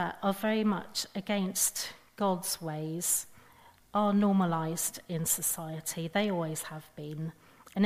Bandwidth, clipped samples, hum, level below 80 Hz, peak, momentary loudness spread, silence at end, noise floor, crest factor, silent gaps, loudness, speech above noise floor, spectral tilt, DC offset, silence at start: 15.5 kHz; under 0.1%; none; -68 dBFS; -14 dBFS; 13 LU; 0 s; -59 dBFS; 18 dB; none; -31 LUFS; 27 dB; -4 dB/octave; under 0.1%; 0 s